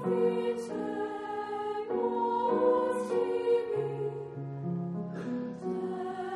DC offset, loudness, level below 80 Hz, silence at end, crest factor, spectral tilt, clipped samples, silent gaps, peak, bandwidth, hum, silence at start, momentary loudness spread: under 0.1%; -32 LUFS; -72 dBFS; 0 s; 16 dB; -7.5 dB/octave; under 0.1%; none; -16 dBFS; 11.5 kHz; none; 0 s; 9 LU